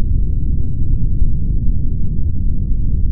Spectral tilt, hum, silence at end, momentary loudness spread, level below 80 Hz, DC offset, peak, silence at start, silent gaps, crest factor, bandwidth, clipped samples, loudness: -19 dB/octave; none; 0 s; 2 LU; -16 dBFS; under 0.1%; -2 dBFS; 0 s; none; 10 dB; 0.7 kHz; under 0.1%; -21 LUFS